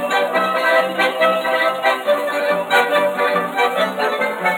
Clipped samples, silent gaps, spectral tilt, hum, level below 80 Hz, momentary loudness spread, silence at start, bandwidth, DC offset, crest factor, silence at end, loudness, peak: under 0.1%; none; -3.5 dB/octave; none; -80 dBFS; 4 LU; 0 s; 18 kHz; under 0.1%; 14 dB; 0 s; -17 LUFS; -2 dBFS